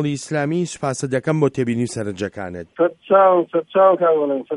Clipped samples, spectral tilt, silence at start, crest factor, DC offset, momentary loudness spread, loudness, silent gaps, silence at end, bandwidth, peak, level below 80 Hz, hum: under 0.1%; -6.5 dB/octave; 0 s; 16 dB; under 0.1%; 12 LU; -19 LUFS; none; 0 s; 11 kHz; -2 dBFS; -60 dBFS; none